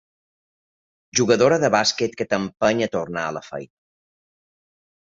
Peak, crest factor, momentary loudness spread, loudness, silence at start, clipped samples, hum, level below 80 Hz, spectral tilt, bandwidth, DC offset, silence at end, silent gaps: -4 dBFS; 20 dB; 13 LU; -20 LUFS; 1.15 s; under 0.1%; none; -60 dBFS; -3.5 dB/octave; 7.8 kHz; under 0.1%; 1.4 s; none